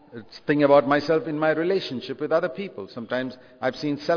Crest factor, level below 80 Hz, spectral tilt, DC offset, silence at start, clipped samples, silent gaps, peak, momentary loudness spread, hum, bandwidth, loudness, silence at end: 18 dB; -66 dBFS; -7 dB/octave; under 0.1%; 0.15 s; under 0.1%; none; -4 dBFS; 17 LU; none; 5.4 kHz; -23 LUFS; 0 s